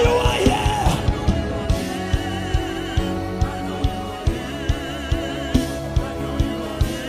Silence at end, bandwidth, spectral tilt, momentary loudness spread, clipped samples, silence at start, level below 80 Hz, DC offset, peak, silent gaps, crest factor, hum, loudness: 0 s; 15.5 kHz; -5.5 dB/octave; 7 LU; under 0.1%; 0 s; -26 dBFS; under 0.1%; -2 dBFS; none; 18 dB; none; -23 LUFS